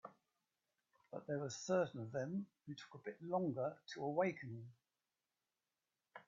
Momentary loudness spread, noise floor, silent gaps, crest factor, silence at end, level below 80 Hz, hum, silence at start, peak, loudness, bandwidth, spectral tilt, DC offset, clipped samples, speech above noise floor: 15 LU; under -90 dBFS; none; 20 dB; 0.05 s; -88 dBFS; none; 0.05 s; -26 dBFS; -44 LUFS; 7.4 kHz; -6 dB/octave; under 0.1%; under 0.1%; over 47 dB